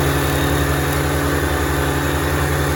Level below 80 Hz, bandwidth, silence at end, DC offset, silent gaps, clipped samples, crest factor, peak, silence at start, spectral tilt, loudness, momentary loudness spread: -26 dBFS; over 20 kHz; 0 s; under 0.1%; none; under 0.1%; 14 dB; -4 dBFS; 0 s; -5 dB/octave; -18 LUFS; 1 LU